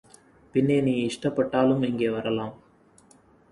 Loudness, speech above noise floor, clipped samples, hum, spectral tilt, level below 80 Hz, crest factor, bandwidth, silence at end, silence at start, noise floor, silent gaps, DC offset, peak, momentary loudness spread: -25 LUFS; 33 dB; under 0.1%; none; -7 dB/octave; -60 dBFS; 18 dB; 11.5 kHz; 0.95 s; 0.55 s; -57 dBFS; none; under 0.1%; -8 dBFS; 7 LU